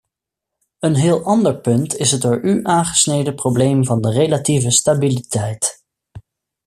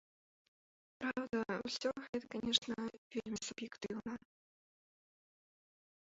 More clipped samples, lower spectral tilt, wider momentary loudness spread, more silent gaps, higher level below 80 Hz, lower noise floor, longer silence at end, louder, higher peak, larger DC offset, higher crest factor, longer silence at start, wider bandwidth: neither; first, -5 dB/octave vs -2 dB/octave; second, 6 LU vs 11 LU; second, none vs 2.09-2.13 s, 2.98-3.10 s; first, -52 dBFS vs -74 dBFS; second, -82 dBFS vs under -90 dBFS; second, 0.45 s vs 1.95 s; first, -16 LUFS vs -41 LUFS; first, 0 dBFS vs -18 dBFS; neither; second, 16 dB vs 26 dB; second, 0.8 s vs 1 s; first, 14.5 kHz vs 7.6 kHz